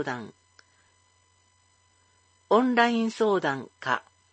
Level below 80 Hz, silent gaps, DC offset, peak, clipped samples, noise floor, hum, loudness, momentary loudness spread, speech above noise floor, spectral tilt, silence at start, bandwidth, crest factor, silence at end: -78 dBFS; none; under 0.1%; -6 dBFS; under 0.1%; -65 dBFS; none; -26 LUFS; 11 LU; 40 dB; -5 dB/octave; 0 s; 8.6 kHz; 22 dB; 0.35 s